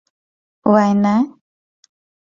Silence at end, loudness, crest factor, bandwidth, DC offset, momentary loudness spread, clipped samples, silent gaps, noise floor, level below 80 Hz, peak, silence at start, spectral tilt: 0.95 s; -16 LUFS; 18 dB; 7.2 kHz; under 0.1%; 9 LU; under 0.1%; none; under -90 dBFS; -60 dBFS; 0 dBFS; 0.65 s; -8 dB/octave